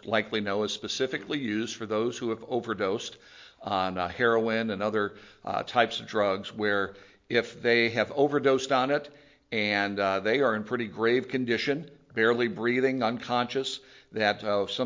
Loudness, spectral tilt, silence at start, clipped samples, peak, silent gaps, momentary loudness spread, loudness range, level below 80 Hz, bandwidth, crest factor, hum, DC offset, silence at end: -28 LUFS; -4.5 dB/octave; 0.05 s; under 0.1%; -6 dBFS; none; 9 LU; 4 LU; -64 dBFS; 7.6 kHz; 22 dB; none; under 0.1%; 0 s